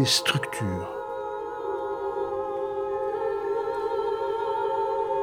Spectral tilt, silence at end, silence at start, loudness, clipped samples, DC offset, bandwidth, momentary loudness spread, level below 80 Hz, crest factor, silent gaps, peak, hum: -4 dB/octave; 0 s; 0 s; -28 LUFS; under 0.1%; under 0.1%; 18 kHz; 6 LU; -58 dBFS; 20 dB; none; -8 dBFS; none